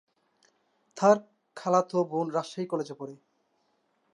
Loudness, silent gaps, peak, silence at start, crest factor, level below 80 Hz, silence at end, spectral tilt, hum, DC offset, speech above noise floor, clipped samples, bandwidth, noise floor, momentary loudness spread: -28 LUFS; none; -8 dBFS; 0.95 s; 22 dB; -84 dBFS; 1 s; -6 dB/octave; none; under 0.1%; 46 dB; under 0.1%; 11 kHz; -73 dBFS; 17 LU